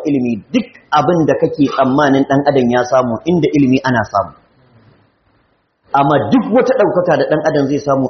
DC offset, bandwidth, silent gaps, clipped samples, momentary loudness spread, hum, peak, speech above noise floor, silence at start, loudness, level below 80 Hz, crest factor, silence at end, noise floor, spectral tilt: under 0.1%; 6.4 kHz; none; under 0.1%; 6 LU; none; 0 dBFS; 46 dB; 0 s; -13 LUFS; -50 dBFS; 14 dB; 0 s; -59 dBFS; -5.5 dB/octave